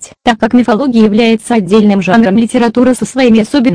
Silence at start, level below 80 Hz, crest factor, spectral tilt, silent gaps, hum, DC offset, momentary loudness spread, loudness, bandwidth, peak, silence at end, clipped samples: 0 s; -42 dBFS; 8 dB; -6 dB/octave; none; none; 0.5%; 3 LU; -9 LUFS; 10.5 kHz; 0 dBFS; 0 s; 0.4%